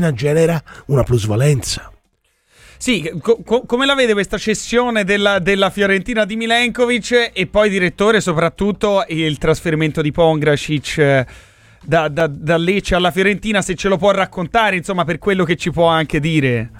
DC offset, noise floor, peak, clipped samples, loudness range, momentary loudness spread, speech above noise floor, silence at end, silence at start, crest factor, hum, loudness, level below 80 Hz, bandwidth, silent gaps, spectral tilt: under 0.1%; -62 dBFS; -2 dBFS; under 0.1%; 3 LU; 4 LU; 47 dB; 0 s; 0 s; 14 dB; none; -16 LUFS; -38 dBFS; 16 kHz; none; -5 dB/octave